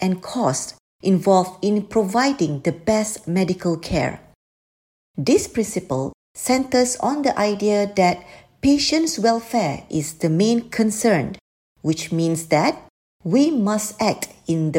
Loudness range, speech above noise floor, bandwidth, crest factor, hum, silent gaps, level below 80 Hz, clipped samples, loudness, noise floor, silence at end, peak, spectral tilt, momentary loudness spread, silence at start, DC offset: 3 LU; over 70 dB; 16.5 kHz; 18 dB; none; 0.80-0.99 s, 4.35-5.14 s, 6.14-6.35 s, 11.41-11.75 s, 12.90-13.19 s; -50 dBFS; under 0.1%; -20 LUFS; under -90 dBFS; 0 s; -2 dBFS; -5 dB/octave; 9 LU; 0 s; under 0.1%